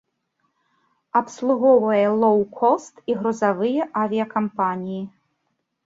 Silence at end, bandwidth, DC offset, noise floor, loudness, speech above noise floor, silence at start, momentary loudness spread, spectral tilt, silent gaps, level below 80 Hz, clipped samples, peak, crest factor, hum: 0.8 s; 7.8 kHz; under 0.1%; -74 dBFS; -21 LUFS; 54 dB; 1.15 s; 10 LU; -6.5 dB/octave; none; -68 dBFS; under 0.1%; -4 dBFS; 16 dB; none